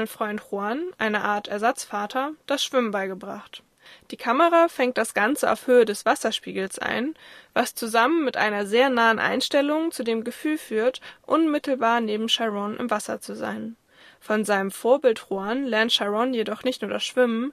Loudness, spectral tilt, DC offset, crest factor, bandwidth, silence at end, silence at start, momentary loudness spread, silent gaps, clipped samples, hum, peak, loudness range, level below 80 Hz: -23 LUFS; -3.5 dB/octave; under 0.1%; 18 dB; 14.5 kHz; 0 s; 0 s; 11 LU; none; under 0.1%; none; -6 dBFS; 4 LU; -70 dBFS